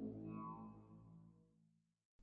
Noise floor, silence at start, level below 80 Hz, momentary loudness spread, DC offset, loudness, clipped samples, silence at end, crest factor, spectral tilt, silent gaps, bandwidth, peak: -79 dBFS; 0 s; -78 dBFS; 15 LU; under 0.1%; -54 LUFS; under 0.1%; 0 s; 16 dB; -8 dB/octave; 2.05-2.19 s; 3.6 kHz; -38 dBFS